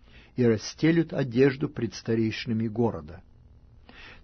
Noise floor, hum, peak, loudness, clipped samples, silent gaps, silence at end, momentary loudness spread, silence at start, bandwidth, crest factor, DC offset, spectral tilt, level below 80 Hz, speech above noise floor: -53 dBFS; none; -10 dBFS; -26 LUFS; under 0.1%; none; 0.1 s; 15 LU; 0.15 s; 6.6 kHz; 18 dB; under 0.1%; -7 dB/octave; -54 dBFS; 28 dB